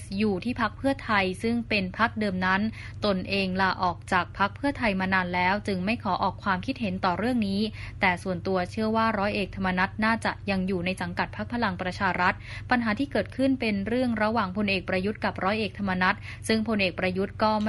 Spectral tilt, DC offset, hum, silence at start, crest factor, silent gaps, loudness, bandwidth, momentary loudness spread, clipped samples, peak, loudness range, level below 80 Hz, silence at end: -6 dB/octave; under 0.1%; none; 0 s; 18 dB; none; -27 LUFS; 11.5 kHz; 4 LU; under 0.1%; -8 dBFS; 1 LU; -48 dBFS; 0 s